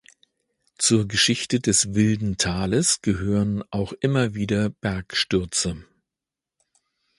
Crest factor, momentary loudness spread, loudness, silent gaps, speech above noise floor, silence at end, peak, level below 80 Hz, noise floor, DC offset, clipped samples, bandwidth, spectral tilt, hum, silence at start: 18 dB; 6 LU; -22 LUFS; none; 66 dB; 1.35 s; -6 dBFS; -46 dBFS; -88 dBFS; under 0.1%; under 0.1%; 11.5 kHz; -4 dB/octave; none; 0.8 s